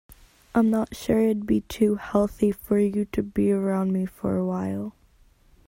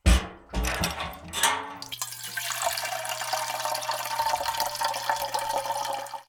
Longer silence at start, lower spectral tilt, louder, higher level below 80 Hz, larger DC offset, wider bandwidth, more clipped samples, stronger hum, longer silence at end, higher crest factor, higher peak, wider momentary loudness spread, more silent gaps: about the same, 0.1 s vs 0.05 s; first, -7.5 dB/octave vs -2.5 dB/octave; first, -25 LUFS vs -28 LUFS; second, -48 dBFS vs -34 dBFS; neither; second, 16.5 kHz vs over 20 kHz; neither; neither; first, 0.75 s vs 0.05 s; second, 16 dB vs 22 dB; about the same, -8 dBFS vs -8 dBFS; second, 5 LU vs 8 LU; neither